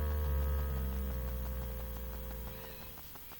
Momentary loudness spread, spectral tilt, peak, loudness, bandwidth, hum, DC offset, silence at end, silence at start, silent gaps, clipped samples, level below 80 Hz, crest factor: 10 LU; -6.5 dB/octave; -26 dBFS; -39 LUFS; 17.5 kHz; none; under 0.1%; 0 s; 0 s; none; under 0.1%; -38 dBFS; 12 dB